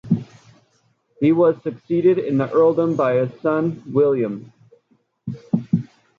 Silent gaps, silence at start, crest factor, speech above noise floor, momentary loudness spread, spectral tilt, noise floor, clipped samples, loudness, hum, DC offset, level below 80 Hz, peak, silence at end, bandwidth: none; 0.05 s; 16 dB; 45 dB; 11 LU; -10 dB/octave; -63 dBFS; under 0.1%; -19 LUFS; none; under 0.1%; -62 dBFS; -4 dBFS; 0.3 s; 7 kHz